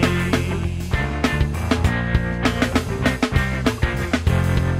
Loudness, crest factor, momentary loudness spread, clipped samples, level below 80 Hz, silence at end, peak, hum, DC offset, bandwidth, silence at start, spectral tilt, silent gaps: -21 LUFS; 16 dB; 4 LU; under 0.1%; -28 dBFS; 0 s; -4 dBFS; none; under 0.1%; 16 kHz; 0 s; -6 dB/octave; none